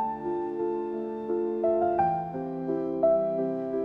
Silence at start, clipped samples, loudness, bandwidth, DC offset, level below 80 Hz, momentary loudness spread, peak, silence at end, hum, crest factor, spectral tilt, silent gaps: 0 s; under 0.1%; -28 LUFS; 4.7 kHz; under 0.1%; -64 dBFS; 8 LU; -14 dBFS; 0 s; none; 14 dB; -10.5 dB/octave; none